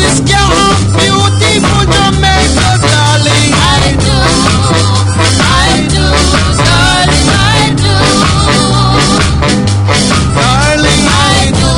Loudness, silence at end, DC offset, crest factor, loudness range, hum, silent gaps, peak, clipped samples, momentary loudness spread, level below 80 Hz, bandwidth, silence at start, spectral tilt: -7 LUFS; 0 s; under 0.1%; 8 dB; 1 LU; none; none; 0 dBFS; 0.9%; 2 LU; -18 dBFS; 13.5 kHz; 0 s; -4 dB/octave